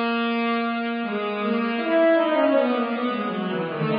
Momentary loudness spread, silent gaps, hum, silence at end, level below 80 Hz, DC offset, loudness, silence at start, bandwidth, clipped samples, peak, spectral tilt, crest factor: 7 LU; none; none; 0 s; -72 dBFS; under 0.1%; -23 LUFS; 0 s; 5.2 kHz; under 0.1%; -8 dBFS; -10.5 dB/octave; 14 dB